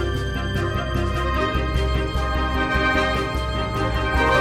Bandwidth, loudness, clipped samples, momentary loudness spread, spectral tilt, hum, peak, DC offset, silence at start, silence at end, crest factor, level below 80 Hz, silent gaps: 14 kHz; -22 LUFS; under 0.1%; 5 LU; -6 dB/octave; none; -6 dBFS; under 0.1%; 0 s; 0 s; 16 dB; -26 dBFS; none